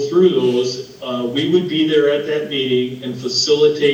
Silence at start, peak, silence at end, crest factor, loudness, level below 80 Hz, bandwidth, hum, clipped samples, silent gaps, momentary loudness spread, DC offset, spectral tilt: 0 s; -2 dBFS; 0 s; 14 dB; -17 LUFS; -62 dBFS; 9 kHz; none; under 0.1%; none; 10 LU; under 0.1%; -4.5 dB/octave